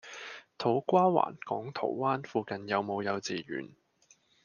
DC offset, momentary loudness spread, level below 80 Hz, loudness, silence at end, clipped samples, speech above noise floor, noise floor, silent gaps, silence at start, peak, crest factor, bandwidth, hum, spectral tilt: under 0.1%; 16 LU; -80 dBFS; -31 LUFS; 0.75 s; under 0.1%; 36 dB; -66 dBFS; none; 0.05 s; -10 dBFS; 22 dB; 7.2 kHz; none; -6 dB/octave